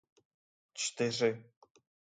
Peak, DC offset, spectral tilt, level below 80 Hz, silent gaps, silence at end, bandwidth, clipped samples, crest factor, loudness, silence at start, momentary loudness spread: -16 dBFS; under 0.1%; -3.5 dB/octave; -82 dBFS; none; 0.75 s; 9.6 kHz; under 0.1%; 22 dB; -34 LUFS; 0.75 s; 16 LU